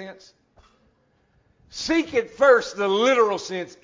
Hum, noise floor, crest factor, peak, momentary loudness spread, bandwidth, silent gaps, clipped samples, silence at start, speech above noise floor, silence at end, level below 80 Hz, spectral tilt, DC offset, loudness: none; -64 dBFS; 18 dB; -4 dBFS; 14 LU; 7.6 kHz; none; under 0.1%; 0 s; 43 dB; 0.15 s; -58 dBFS; -3.5 dB/octave; under 0.1%; -21 LUFS